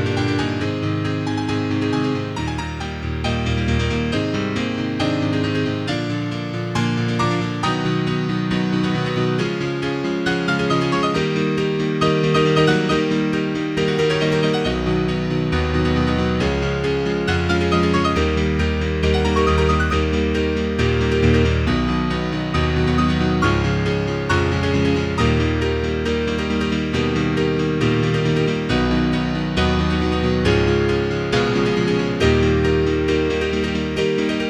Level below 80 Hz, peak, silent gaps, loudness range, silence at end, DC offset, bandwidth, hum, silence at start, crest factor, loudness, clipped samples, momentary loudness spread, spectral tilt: -30 dBFS; -2 dBFS; none; 3 LU; 0 s; under 0.1%; 11 kHz; none; 0 s; 16 dB; -19 LUFS; under 0.1%; 5 LU; -6.5 dB/octave